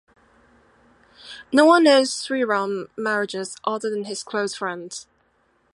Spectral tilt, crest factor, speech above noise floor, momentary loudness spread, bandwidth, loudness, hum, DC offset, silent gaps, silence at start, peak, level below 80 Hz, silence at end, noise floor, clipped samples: -3.5 dB/octave; 20 dB; 44 dB; 19 LU; 11.5 kHz; -21 LUFS; none; under 0.1%; none; 1.25 s; -2 dBFS; -70 dBFS; 0.7 s; -64 dBFS; under 0.1%